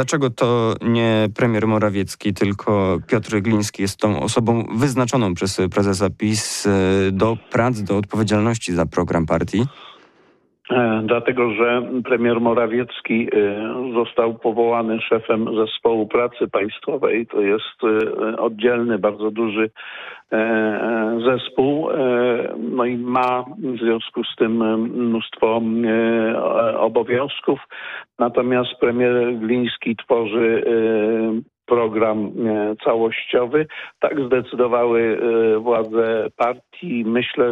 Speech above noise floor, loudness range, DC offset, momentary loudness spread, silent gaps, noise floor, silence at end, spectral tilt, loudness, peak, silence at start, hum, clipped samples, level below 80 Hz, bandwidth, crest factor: 38 dB; 2 LU; under 0.1%; 5 LU; none; -57 dBFS; 0 s; -6 dB/octave; -19 LUFS; -6 dBFS; 0 s; none; under 0.1%; -52 dBFS; 13.5 kHz; 14 dB